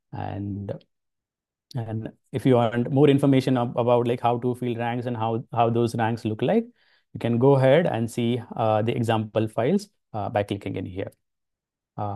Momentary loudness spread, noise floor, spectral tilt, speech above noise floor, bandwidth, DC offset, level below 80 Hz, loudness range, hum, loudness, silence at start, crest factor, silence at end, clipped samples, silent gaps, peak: 15 LU; -89 dBFS; -7.5 dB/octave; 66 dB; 12.5 kHz; under 0.1%; -64 dBFS; 4 LU; none; -24 LUFS; 0.15 s; 18 dB; 0 s; under 0.1%; none; -6 dBFS